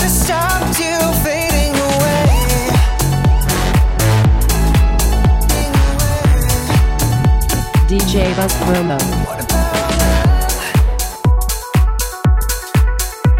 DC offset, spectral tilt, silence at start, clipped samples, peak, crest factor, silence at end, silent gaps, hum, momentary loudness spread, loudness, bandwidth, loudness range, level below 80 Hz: under 0.1%; -5 dB/octave; 0 s; under 0.1%; -2 dBFS; 10 dB; 0 s; none; none; 4 LU; -14 LUFS; 17 kHz; 2 LU; -16 dBFS